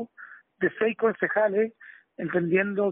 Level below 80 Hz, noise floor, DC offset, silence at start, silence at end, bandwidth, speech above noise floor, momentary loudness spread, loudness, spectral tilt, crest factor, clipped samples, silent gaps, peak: -72 dBFS; -49 dBFS; under 0.1%; 0 s; 0 s; 3.8 kHz; 24 dB; 15 LU; -26 LUFS; -2 dB/octave; 16 dB; under 0.1%; none; -10 dBFS